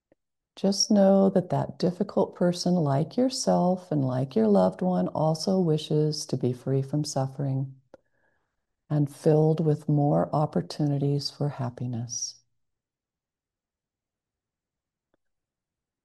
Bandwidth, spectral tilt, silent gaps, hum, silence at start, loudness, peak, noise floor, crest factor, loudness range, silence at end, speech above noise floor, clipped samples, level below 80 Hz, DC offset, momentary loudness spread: 12.5 kHz; -6.5 dB/octave; none; none; 0.55 s; -26 LUFS; -10 dBFS; under -90 dBFS; 18 dB; 9 LU; 3.7 s; over 65 dB; under 0.1%; -68 dBFS; under 0.1%; 9 LU